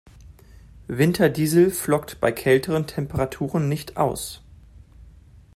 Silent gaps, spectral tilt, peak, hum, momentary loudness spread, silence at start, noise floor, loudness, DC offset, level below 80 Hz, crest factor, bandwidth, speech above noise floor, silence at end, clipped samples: none; -6 dB/octave; -4 dBFS; none; 10 LU; 0.25 s; -48 dBFS; -22 LUFS; under 0.1%; -48 dBFS; 20 dB; 16 kHz; 27 dB; 0.5 s; under 0.1%